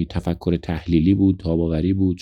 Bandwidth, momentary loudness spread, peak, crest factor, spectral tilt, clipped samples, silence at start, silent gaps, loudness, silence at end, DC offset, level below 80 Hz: 7.6 kHz; 7 LU; -6 dBFS; 14 dB; -9.5 dB/octave; under 0.1%; 0 s; none; -20 LUFS; 0.05 s; under 0.1%; -36 dBFS